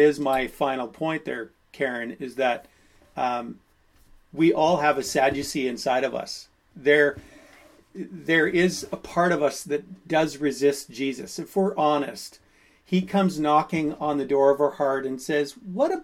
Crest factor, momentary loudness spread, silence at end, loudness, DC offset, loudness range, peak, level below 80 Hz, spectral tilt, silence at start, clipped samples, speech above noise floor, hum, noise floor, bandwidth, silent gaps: 20 dB; 14 LU; 0 s; -24 LUFS; under 0.1%; 4 LU; -6 dBFS; -58 dBFS; -5 dB/octave; 0 s; under 0.1%; 32 dB; none; -56 dBFS; 16 kHz; none